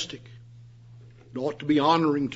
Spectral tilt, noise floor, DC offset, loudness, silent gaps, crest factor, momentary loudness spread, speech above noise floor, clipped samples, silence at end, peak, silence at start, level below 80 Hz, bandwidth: -6 dB/octave; -49 dBFS; under 0.1%; -24 LUFS; none; 20 dB; 18 LU; 24 dB; under 0.1%; 0 s; -8 dBFS; 0 s; -64 dBFS; 8 kHz